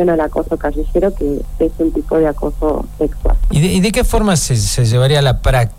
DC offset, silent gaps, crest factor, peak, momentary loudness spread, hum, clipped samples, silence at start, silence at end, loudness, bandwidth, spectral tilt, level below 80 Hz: 2%; none; 12 dB; -2 dBFS; 7 LU; none; under 0.1%; 0 s; 0 s; -15 LUFS; 16 kHz; -5.5 dB/octave; -20 dBFS